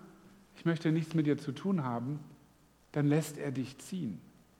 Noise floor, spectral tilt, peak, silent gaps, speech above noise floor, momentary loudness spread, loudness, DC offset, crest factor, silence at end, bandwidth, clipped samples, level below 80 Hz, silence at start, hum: -64 dBFS; -7 dB/octave; -18 dBFS; none; 31 dB; 10 LU; -34 LUFS; under 0.1%; 18 dB; 0.35 s; 15.5 kHz; under 0.1%; -72 dBFS; 0.05 s; none